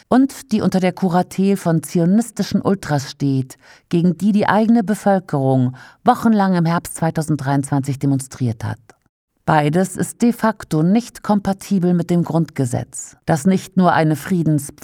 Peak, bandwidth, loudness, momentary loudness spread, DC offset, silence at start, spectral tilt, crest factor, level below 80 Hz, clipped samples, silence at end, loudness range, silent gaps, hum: 0 dBFS; 16 kHz; -18 LUFS; 7 LU; under 0.1%; 0.1 s; -7 dB/octave; 18 dB; -52 dBFS; under 0.1%; 0.15 s; 3 LU; 9.09-9.28 s; none